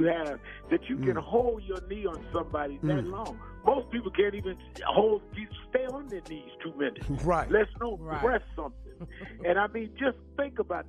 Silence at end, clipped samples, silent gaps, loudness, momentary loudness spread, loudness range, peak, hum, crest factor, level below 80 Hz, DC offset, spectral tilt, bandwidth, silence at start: 0 s; under 0.1%; none; -30 LUFS; 14 LU; 2 LU; -8 dBFS; none; 22 dB; -46 dBFS; under 0.1%; -7 dB/octave; 10.5 kHz; 0 s